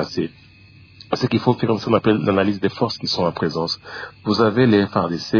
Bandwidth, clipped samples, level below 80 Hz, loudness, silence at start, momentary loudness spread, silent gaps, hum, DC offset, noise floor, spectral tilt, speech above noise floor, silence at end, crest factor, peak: 5.4 kHz; under 0.1%; -54 dBFS; -20 LUFS; 0 s; 11 LU; none; none; under 0.1%; -45 dBFS; -6.5 dB/octave; 26 dB; 0 s; 18 dB; -2 dBFS